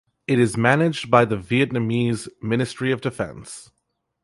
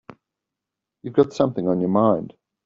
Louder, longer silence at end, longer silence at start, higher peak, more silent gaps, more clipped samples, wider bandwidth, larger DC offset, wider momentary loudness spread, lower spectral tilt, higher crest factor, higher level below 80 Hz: about the same, -21 LUFS vs -21 LUFS; first, 0.6 s vs 0.35 s; second, 0.3 s vs 1.05 s; about the same, -2 dBFS vs -4 dBFS; neither; neither; first, 11.5 kHz vs 7.6 kHz; neither; about the same, 12 LU vs 13 LU; second, -6 dB/octave vs -8 dB/octave; about the same, 20 dB vs 20 dB; first, -54 dBFS vs -62 dBFS